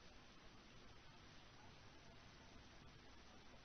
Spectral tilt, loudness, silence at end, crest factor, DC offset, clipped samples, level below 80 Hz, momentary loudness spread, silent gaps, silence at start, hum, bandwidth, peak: -3 dB/octave; -64 LUFS; 0 s; 14 dB; under 0.1%; under 0.1%; -70 dBFS; 1 LU; none; 0 s; none; 6.4 kHz; -48 dBFS